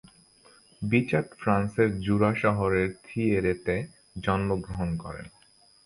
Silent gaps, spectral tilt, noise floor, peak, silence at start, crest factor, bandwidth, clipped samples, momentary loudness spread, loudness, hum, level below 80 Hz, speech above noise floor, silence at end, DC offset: none; -7.5 dB/octave; -59 dBFS; -8 dBFS; 0.8 s; 20 dB; 11 kHz; under 0.1%; 10 LU; -27 LUFS; none; -48 dBFS; 33 dB; 0.55 s; under 0.1%